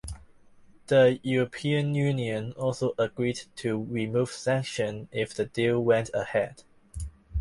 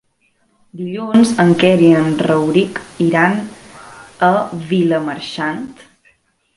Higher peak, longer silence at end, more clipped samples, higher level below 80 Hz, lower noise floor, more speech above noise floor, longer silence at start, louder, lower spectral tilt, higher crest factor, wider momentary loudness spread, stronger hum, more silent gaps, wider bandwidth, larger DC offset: second, -10 dBFS vs 0 dBFS; second, 0 s vs 0.85 s; neither; first, -48 dBFS vs -56 dBFS; second, -54 dBFS vs -61 dBFS; second, 28 dB vs 47 dB; second, 0.05 s vs 0.75 s; second, -27 LUFS vs -14 LUFS; about the same, -6 dB/octave vs -6.5 dB/octave; about the same, 18 dB vs 16 dB; about the same, 13 LU vs 14 LU; neither; neither; about the same, 11.5 kHz vs 11.5 kHz; neither